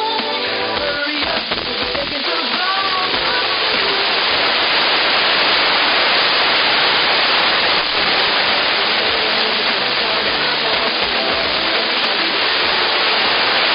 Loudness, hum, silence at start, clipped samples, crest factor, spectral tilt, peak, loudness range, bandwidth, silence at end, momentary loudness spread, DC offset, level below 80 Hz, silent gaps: -14 LUFS; none; 0 s; under 0.1%; 14 dB; 1.5 dB/octave; -2 dBFS; 4 LU; 5.8 kHz; 0 s; 6 LU; under 0.1%; -48 dBFS; none